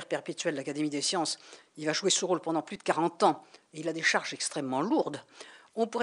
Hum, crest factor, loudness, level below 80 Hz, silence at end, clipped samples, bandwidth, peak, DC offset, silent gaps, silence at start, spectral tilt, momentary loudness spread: none; 20 dB; -30 LUFS; -84 dBFS; 0 s; under 0.1%; 11 kHz; -10 dBFS; under 0.1%; none; 0 s; -3 dB/octave; 14 LU